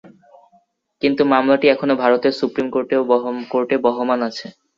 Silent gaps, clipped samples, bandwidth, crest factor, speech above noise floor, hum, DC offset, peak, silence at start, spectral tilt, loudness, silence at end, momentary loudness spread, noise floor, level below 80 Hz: none; under 0.1%; 7.4 kHz; 16 dB; 41 dB; none; under 0.1%; -2 dBFS; 0.05 s; -6 dB/octave; -18 LUFS; 0.25 s; 7 LU; -59 dBFS; -62 dBFS